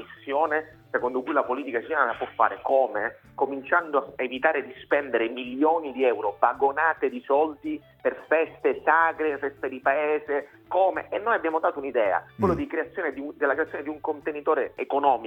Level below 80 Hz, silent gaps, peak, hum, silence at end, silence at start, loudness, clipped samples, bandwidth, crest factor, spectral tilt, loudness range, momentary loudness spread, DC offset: -60 dBFS; none; -4 dBFS; none; 0 s; 0 s; -26 LUFS; under 0.1%; 5.8 kHz; 20 dB; -7.5 dB/octave; 2 LU; 7 LU; under 0.1%